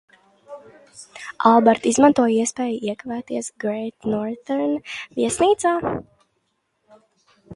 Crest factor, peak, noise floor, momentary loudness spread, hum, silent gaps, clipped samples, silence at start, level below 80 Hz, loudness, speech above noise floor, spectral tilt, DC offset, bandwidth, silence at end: 22 dB; 0 dBFS; -71 dBFS; 16 LU; none; none; under 0.1%; 0.5 s; -58 dBFS; -20 LUFS; 51 dB; -4.5 dB/octave; under 0.1%; 11.5 kHz; 0 s